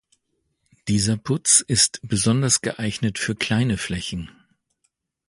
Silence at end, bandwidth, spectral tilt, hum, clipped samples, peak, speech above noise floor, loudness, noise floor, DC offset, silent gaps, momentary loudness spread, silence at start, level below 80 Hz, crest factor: 1 s; 11.5 kHz; -3.5 dB/octave; none; under 0.1%; -2 dBFS; 51 dB; -20 LUFS; -73 dBFS; under 0.1%; none; 13 LU; 0.85 s; -48 dBFS; 22 dB